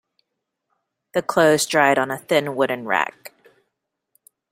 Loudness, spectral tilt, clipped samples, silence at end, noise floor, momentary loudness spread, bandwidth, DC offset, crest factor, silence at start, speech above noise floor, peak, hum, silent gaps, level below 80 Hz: -20 LUFS; -3.5 dB/octave; under 0.1%; 1.25 s; -79 dBFS; 9 LU; 16 kHz; under 0.1%; 20 dB; 1.15 s; 60 dB; -2 dBFS; none; none; -66 dBFS